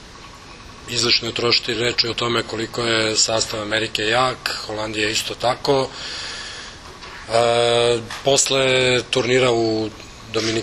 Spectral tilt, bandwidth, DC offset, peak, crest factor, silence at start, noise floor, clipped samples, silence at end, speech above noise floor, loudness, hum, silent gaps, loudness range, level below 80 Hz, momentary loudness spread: -2.5 dB/octave; 13.5 kHz; under 0.1%; -2 dBFS; 18 dB; 0 s; -40 dBFS; under 0.1%; 0 s; 20 dB; -19 LUFS; none; none; 4 LU; -48 dBFS; 19 LU